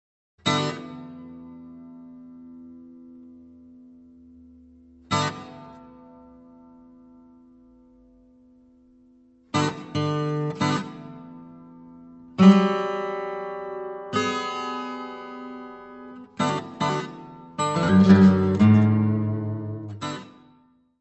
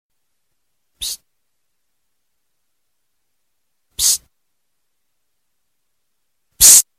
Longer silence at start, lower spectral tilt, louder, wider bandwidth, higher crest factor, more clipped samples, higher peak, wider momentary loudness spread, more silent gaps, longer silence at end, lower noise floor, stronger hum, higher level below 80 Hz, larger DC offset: second, 0.45 s vs 1 s; first, -6.5 dB/octave vs 2.5 dB/octave; second, -23 LUFS vs -10 LUFS; second, 8.4 kHz vs 16.5 kHz; about the same, 22 dB vs 22 dB; neither; about the same, -2 dBFS vs 0 dBFS; first, 27 LU vs 24 LU; neither; first, 0.7 s vs 0.15 s; second, -59 dBFS vs -75 dBFS; neither; second, -62 dBFS vs -50 dBFS; neither